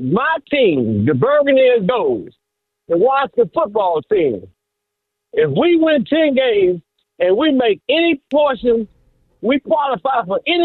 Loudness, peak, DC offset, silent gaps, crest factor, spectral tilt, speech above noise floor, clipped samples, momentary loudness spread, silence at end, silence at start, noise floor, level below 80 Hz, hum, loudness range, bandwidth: -16 LUFS; -4 dBFS; under 0.1%; none; 12 dB; -9.5 dB/octave; 63 dB; under 0.1%; 7 LU; 0 s; 0 s; -78 dBFS; -54 dBFS; none; 3 LU; 4.3 kHz